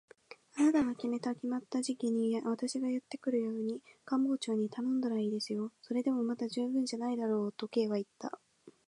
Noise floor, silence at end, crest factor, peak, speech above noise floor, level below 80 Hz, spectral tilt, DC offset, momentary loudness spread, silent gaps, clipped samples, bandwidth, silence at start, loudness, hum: -56 dBFS; 0.15 s; 16 dB; -18 dBFS; 22 dB; -78 dBFS; -5.5 dB/octave; under 0.1%; 6 LU; none; under 0.1%; 11.5 kHz; 0.3 s; -34 LUFS; none